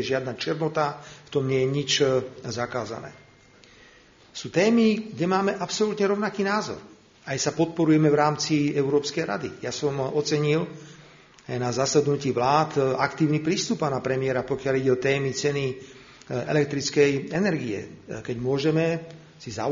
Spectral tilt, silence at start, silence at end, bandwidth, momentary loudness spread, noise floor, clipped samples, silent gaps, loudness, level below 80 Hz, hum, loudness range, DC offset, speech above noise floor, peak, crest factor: -5 dB/octave; 0 s; 0 s; 7.4 kHz; 13 LU; -54 dBFS; under 0.1%; none; -25 LUFS; -60 dBFS; none; 3 LU; under 0.1%; 29 dB; -6 dBFS; 20 dB